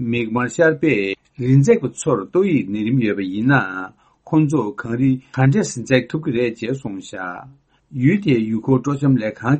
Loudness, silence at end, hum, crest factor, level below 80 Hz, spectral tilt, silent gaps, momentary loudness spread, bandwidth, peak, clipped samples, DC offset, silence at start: -18 LUFS; 0 s; none; 18 dB; -54 dBFS; -7 dB/octave; none; 11 LU; 8.8 kHz; 0 dBFS; under 0.1%; under 0.1%; 0 s